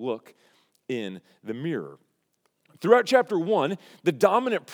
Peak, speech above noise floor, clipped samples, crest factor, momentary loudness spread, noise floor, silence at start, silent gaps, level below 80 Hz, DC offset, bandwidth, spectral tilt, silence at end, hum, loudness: -2 dBFS; 48 dB; under 0.1%; 24 dB; 17 LU; -73 dBFS; 0 s; none; under -90 dBFS; under 0.1%; 17 kHz; -5.5 dB/octave; 0 s; none; -24 LUFS